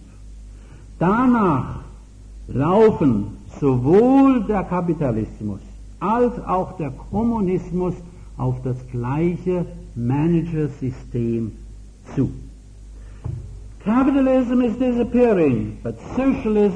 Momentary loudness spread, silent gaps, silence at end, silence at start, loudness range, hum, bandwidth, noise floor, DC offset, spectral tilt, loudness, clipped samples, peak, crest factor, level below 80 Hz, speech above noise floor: 16 LU; none; 0 s; 0 s; 7 LU; none; 9.4 kHz; -40 dBFS; under 0.1%; -9.5 dB/octave; -20 LUFS; under 0.1%; -6 dBFS; 16 dB; -38 dBFS; 21 dB